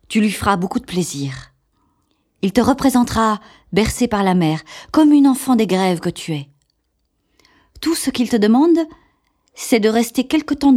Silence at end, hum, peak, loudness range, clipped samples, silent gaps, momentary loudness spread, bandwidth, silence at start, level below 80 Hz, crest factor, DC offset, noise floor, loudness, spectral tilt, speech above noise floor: 0 s; none; 0 dBFS; 4 LU; under 0.1%; none; 13 LU; 16 kHz; 0.1 s; -42 dBFS; 16 dB; under 0.1%; -68 dBFS; -17 LUFS; -5.5 dB/octave; 52 dB